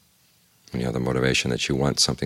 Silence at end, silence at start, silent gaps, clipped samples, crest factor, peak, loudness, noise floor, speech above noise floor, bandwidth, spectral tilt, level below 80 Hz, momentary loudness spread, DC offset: 0 s; 0.7 s; none; under 0.1%; 18 dB; -8 dBFS; -23 LUFS; -61 dBFS; 38 dB; 16 kHz; -4 dB/octave; -44 dBFS; 9 LU; under 0.1%